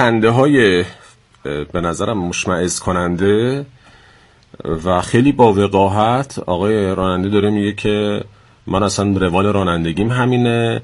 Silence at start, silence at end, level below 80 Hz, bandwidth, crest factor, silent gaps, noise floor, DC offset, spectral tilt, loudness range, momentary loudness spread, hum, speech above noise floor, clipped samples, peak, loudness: 0 s; 0 s; -42 dBFS; 11.5 kHz; 16 dB; none; -48 dBFS; under 0.1%; -6 dB/octave; 4 LU; 13 LU; none; 33 dB; under 0.1%; 0 dBFS; -16 LUFS